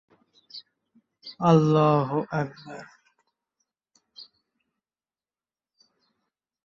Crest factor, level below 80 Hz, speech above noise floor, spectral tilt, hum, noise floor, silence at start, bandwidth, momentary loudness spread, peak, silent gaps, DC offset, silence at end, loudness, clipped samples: 22 dB; -68 dBFS; over 68 dB; -8 dB/octave; none; under -90 dBFS; 0.55 s; 7.2 kHz; 27 LU; -6 dBFS; none; under 0.1%; 2.4 s; -23 LUFS; under 0.1%